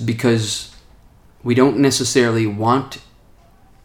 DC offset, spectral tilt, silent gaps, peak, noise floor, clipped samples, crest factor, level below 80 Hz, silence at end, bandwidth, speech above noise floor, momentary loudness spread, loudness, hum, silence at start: under 0.1%; -5 dB/octave; none; -2 dBFS; -49 dBFS; under 0.1%; 18 dB; -50 dBFS; 0.85 s; 19 kHz; 32 dB; 17 LU; -17 LUFS; none; 0 s